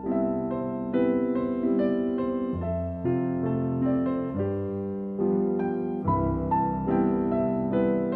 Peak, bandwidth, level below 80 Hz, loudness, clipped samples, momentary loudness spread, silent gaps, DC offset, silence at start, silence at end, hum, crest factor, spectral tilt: -12 dBFS; 4 kHz; -46 dBFS; -27 LUFS; under 0.1%; 5 LU; none; under 0.1%; 0 s; 0 s; none; 14 dB; -12 dB/octave